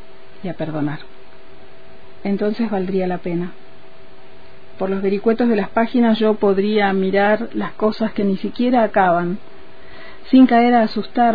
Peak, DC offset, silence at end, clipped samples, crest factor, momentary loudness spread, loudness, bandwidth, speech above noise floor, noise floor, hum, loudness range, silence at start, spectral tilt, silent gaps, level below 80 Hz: -2 dBFS; 4%; 0 s; under 0.1%; 16 dB; 13 LU; -18 LUFS; 5 kHz; 28 dB; -45 dBFS; none; 8 LU; 0.45 s; -9.5 dB/octave; none; -52 dBFS